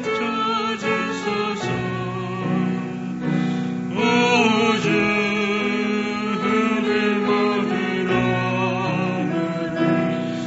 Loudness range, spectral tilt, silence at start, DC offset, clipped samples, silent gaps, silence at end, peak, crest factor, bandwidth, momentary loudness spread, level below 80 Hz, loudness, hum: 4 LU; -4 dB/octave; 0 s; under 0.1%; under 0.1%; none; 0 s; -6 dBFS; 16 dB; 8 kHz; 7 LU; -54 dBFS; -21 LUFS; none